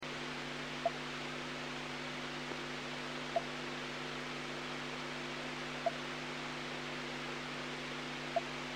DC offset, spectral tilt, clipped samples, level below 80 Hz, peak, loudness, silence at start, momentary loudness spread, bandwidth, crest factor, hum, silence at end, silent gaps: under 0.1%; -3.5 dB/octave; under 0.1%; -66 dBFS; -22 dBFS; -41 LUFS; 0 s; 3 LU; 16.5 kHz; 18 dB; 50 Hz at -55 dBFS; 0 s; none